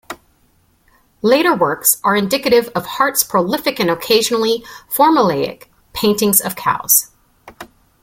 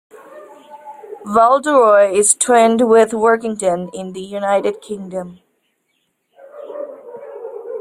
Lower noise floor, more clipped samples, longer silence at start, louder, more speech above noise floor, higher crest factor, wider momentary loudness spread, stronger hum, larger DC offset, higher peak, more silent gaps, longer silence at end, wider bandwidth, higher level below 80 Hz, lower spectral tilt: second, -57 dBFS vs -68 dBFS; neither; second, 0.1 s vs 0.35 s; about the same, -15 LUFS vs -14 LUFS; second, 42 dB vs 53 dB; about the same, 16 dB vs 16 dB; second, 11 LU vs 22 LU; neither; neither; about the same, 0 dBFS vs 0 dBFS; neither; first, 0.4 s vs 0 s; about the same, 17 kHz vs 16 kHz; first, -54 dBFS vs -60 dBFS; about the same, -3 dB/octave vs -3.5 dB/octave